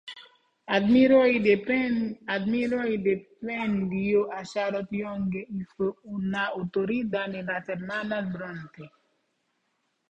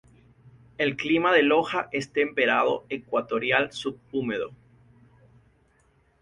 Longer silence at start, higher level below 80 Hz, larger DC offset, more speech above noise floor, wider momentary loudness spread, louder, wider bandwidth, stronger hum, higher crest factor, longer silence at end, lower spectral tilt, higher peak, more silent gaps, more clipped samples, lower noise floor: second, 0.05 s vs 0.45 s; about the same, -62 dBFS vs -64 dBFS; neither; first, 49 dB vs 39 dB; first, 14 LU vs 11 LU; about the same, -27 LUFS vs -25 LUFS; second, 8 kHz vs 11 kHz; neither; about the same, 18 dB vs 22 dB; second, 1.25 s vs 1.65 s; first, -7 dB/octave vs -5 dB/octave; second, -10 dBFS vs -6 dBFS; neither; neither; first, -75 dBFS vs -64 dBFS